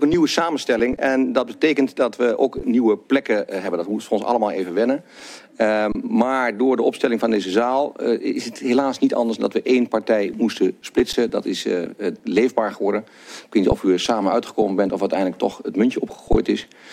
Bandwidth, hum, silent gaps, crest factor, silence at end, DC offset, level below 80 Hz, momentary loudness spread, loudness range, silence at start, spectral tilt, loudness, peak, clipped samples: 14.5 kHz; none; none; 16 dB; 0 s; under 0.1%; -42 dBFS; 6 LU; 2 LU; 0 s; -5 dB/octave; -20 LUFS; -4 dBFS; under 0.1%